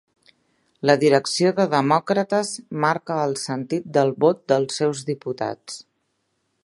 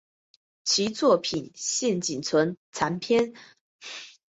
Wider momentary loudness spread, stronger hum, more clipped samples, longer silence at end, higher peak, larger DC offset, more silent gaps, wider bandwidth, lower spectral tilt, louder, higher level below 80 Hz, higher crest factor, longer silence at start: second, 10 LU vs 17 LU; neither; neither; first, 0.9 s vs 0.25 s; first, 0 dBFS vs -8 dBFS; neither; second, none vs 2.57-2.72 s, 3.61-3.79 s; first, 11.5 kHz vs 8.2 kHz; first, -5 dB/octave vs -3.5 dB/octave; first, -21 LUFS vs -25 LUFS; about the same, -70 dBFS vs -66 dBFS; about the same, 22 dB vs 18 dB; first, 0.85 s vs 0.65 s